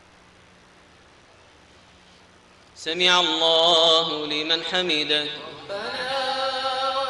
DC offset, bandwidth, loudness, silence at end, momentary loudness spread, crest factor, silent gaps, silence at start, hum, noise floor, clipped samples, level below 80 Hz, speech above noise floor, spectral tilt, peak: under 0.1%; 11.5 kHz; -20 LUFS; 0 s; 14 LU; 18 dB; none; 2.75 s; none; -53 dBFS; under 0.1%; -64 dBFS; 32 dB; -2 dB/octave; -6 dBFS